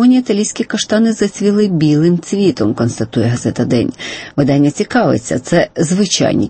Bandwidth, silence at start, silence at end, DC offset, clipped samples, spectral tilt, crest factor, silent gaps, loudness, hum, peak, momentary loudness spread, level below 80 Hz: 8.8 kHz; 0 s; 0 s; under 0.1%; under 0.1%; -5.5 dB/octave; 12 dB; none; -14 LUFS; none; -2 dBFS; 5 LU; -46 dBFS